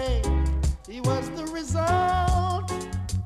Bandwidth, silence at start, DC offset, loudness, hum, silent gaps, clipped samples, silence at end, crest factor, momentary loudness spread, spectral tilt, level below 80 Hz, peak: 13.5 kHz; 0 s; under 0.1%; -26 LUFS; none; none; under 0.1%; 0 s; 14 dB; 8 LU; -6 dB/octave; -30 dBFS; -10 dBFS